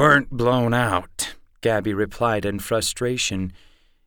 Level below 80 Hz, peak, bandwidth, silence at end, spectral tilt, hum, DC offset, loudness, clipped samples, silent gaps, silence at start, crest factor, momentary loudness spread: -44 dBFS; -4 dBFS; over 20 kHz; 0.55 s; -4.5 dB/octave; none; under 0.1%; -22 LUFS; under 0.1%; none; 0 s; 18 dB; 10 LU